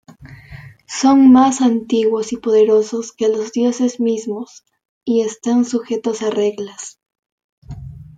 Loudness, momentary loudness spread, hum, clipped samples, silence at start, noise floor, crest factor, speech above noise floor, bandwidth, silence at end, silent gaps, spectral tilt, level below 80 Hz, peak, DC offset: -16 LUFS; 22 LU; none; under 0.1%; 0.2 s; -38 dBFS; 14 dB; 23 dB; 9.2 kHz; 0.15 s; 4.89-5.01 s, 7.32-7.38 s, 7.44-7.62 s; -5 dB/octave; -52 dBFS; -2 dBFS; under 0.1%